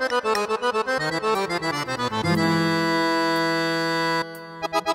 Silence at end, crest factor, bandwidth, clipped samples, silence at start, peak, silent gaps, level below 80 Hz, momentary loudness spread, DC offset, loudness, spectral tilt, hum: 0 s; 14 dB; 16 kHz; under 0.1%; 0 s; -8 dBFS; none; -60 dBFS; 5 LU; under 0.1%; -23 LUFS; -4.5 dB/octave; none